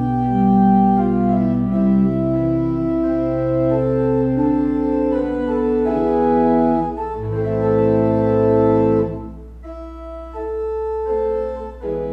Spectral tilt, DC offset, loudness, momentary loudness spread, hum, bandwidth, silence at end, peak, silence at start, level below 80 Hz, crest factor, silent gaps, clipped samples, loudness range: -11 dB/octave; under 0.1%; -18 LUFS; 12 LU; none; 5.6 kHz; 0 s; -4 dBFS; 0 s; -36 dBFS; 14 dB; none; under 0.1%; 3 LU